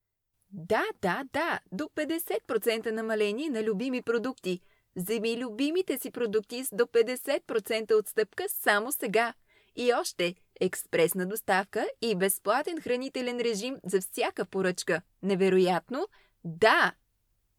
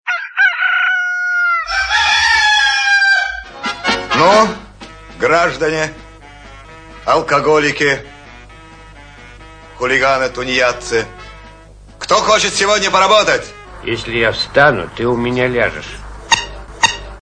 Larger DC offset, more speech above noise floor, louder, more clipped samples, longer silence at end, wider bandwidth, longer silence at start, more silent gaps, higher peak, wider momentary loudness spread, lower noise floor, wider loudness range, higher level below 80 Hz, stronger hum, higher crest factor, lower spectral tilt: neither; first, 49 dB vs 25 dB; second, -29 LUFS vs -13 LUFS; neither; first, 0.7 s vs 0.05 s; first, 20 kHz vs 10.5 kHz; first, 0.5 s vs 0.05 s; neither; second, -8 dBFS vs 0 dBFS; second, 8 LU vs 13 LU; first, -78 dBFS vs -39 dBFS; second, 3 LU vs 6 LU; second, -72 dBFS vs -40 dBFS; neither; about the same, 20 dB vs 16 dB; first, -4 dB/octave vs -2.5 dB/octave